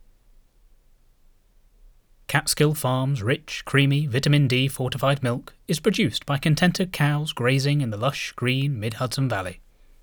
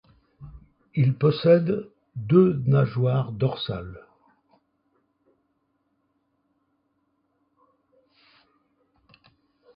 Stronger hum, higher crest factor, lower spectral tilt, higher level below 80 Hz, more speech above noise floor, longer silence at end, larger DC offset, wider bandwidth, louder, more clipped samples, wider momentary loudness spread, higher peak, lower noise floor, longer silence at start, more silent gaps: neither; about the same, 20 dB vs 22 dB; second, -5 dB/octave vs -12 dB/octave; first, -50 dBFS vs -58 dBFS; second, 34 dB vs 51 dB; second, 0.45 s vs 5.75 s; neither; first, over 20 kHz vs 5.4 kHz; about the same, -23 LUFS vs -23 LUFS; neither; second, 7 LU vs 16 LU; about the same, -4 dBFS vs -6 dBFS; second, -57 dBFS vs -73 dBFS; first, 2.3 s vs 0.4 s; neither